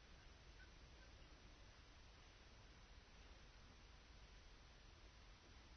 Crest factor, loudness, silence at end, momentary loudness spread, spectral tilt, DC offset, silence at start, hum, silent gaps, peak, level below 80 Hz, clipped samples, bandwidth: 14 dB; -66 LUFS; 0 s; 1 LU; -3 dB/octave; under 0.1%; 0 s; none; none; -50 dBFS; -66 dBFS; under 0.1%; 6.4 kHz